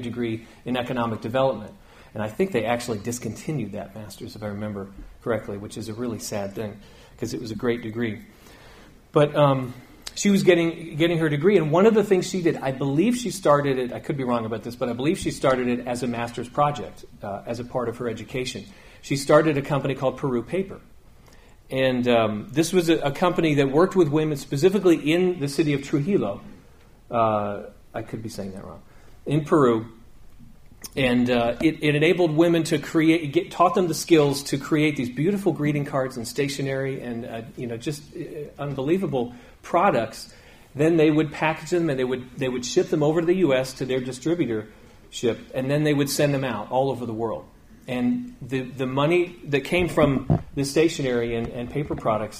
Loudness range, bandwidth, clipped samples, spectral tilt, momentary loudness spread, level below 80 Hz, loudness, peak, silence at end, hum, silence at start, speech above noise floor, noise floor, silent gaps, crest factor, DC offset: 8 LU; 15.5 kHz; under 0.1%; -6 dB/octave; 15 LU; -50 dBFS; -23 LUFS; -4 dBFS; 0 s; none; 0 s; 27 dB; -50 dBFS; none; 20 dB; under 0.1%